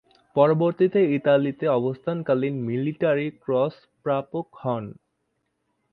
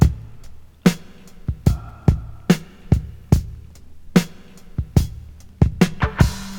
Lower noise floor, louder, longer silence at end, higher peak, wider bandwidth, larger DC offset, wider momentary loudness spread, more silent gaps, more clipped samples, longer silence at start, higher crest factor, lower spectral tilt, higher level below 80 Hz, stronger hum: first, -75 dBFS vs -39 dBFS; second, -24 LUFS vs -21 LUFS; first, 1 s vs 0 s; second, -4 dBFS vs 0 dBFS; second, 5 kHz vs 18.5 kHz; neither; second, 10 LU vs 14 LU; neither; neither; first, 0.35 s vs 0 s; about the same, 20 dB vs 20 dB; first, -10.5 dB/octave vs -6.5 dB/octave; second, -68 dBFS vs -28 dBFS; neither